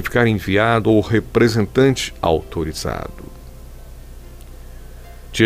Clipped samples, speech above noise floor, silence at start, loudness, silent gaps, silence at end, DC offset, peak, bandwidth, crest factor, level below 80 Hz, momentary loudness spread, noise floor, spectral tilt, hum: under 0.1%; 19 dB; 0 s; -18 LUFS; none; 0 s; under 0.1%; -2 dBFS; 16 kHz; 18 dB; -36 dBFS; 14 LU; -36 dBFS; -6 dB/octave; none